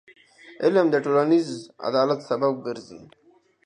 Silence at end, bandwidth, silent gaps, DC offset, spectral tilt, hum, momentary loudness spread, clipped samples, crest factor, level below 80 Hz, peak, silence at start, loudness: 0.6 s; 10 kHz; none; under 0.1%; -6.5 dB/octave; none; 13 LU; under 0.1%; 18 dB; -74 dBFS; -6 dBFS; 0.45 s; -23 LUFS